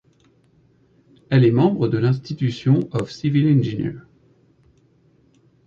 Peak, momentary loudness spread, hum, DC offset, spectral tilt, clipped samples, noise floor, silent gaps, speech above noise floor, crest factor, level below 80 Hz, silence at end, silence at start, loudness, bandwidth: -4 dBFS; 10 LU; none; under 0.1%; -9 dB/octave; under 0.1%; -58 dBFS; none; 39 dB; 18 dB; -56 dBFS; 1.65 s; 1.3 s; -20 LUFS; 7.2 kHz